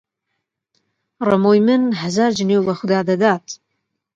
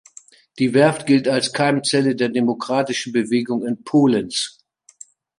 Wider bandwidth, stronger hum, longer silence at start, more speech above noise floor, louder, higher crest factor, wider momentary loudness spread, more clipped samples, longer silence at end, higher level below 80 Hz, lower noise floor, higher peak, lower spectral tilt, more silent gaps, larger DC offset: second, 7.8 kHz vs 11.5 kHz; neither; first, 1.2 s vs 0.55 s; first, 60 dB vs 29 dB; about the same, -17 LUFS vs -19 LUFS; about the same, 18 dB vs 18 dB; about the same, 10 LU vs 8 LU; neither; second, 0.6 s vs 0.9 s; about the same, -62 dBFS vs -64 dBFS; first, -76 dBFS vs -48 dBFS; about the same, 0 dBFS vs -2 dBFS; about the same, -6 dB/octave vs -5 dB/octave; neither; neither